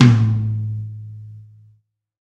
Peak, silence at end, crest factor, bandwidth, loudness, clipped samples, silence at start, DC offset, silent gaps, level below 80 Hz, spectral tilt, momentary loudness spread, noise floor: 0 dBFS; 0.85 s; 18 dB; 7.4 kHz; -19 LUFS; under 0.1%; 0 s; under 0.1%; none; -48 dBFS; -7.5 dB/octave; 23 LU; -59 dBFS